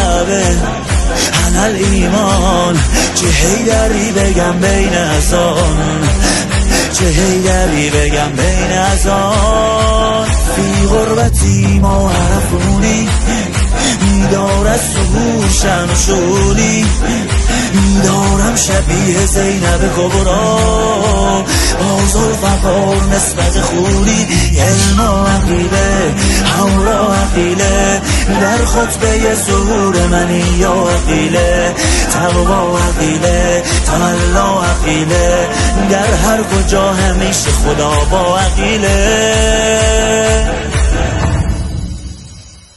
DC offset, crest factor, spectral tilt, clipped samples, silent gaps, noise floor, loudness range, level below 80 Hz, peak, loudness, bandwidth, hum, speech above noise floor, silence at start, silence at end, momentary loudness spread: under 0.1%; 10 dB; -4.5 dB/octave; under 0.1%; none; -34 dBFS; 1 LU; -16 dBFS; 0 dBFS; -11 LUFS; 12.5 kHz; none; 23 dB; 0 s; 0.25 s; 2 LU